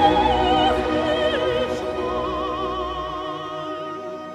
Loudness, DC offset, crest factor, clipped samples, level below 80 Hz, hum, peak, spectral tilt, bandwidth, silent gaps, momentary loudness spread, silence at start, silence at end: -23 LUFS; under 0.1%; 18 dB; under 0.1%; -38 dBFS; none; -4 dBFS; -5.5 dB/octave; 13 kHz; none; 11 LU; 0 s; 0 s